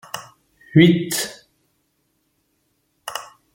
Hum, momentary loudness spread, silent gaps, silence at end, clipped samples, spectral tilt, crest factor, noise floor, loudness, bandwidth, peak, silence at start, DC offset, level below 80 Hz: none; 20 LU; none; 0.3 s; under 0.1%; -5 dB/octave; 22 dB; -69 dBFS; -18 LUFS; 17 kHz; -2 dBFS; 0.15 s; under 0.1%; -58 dBFS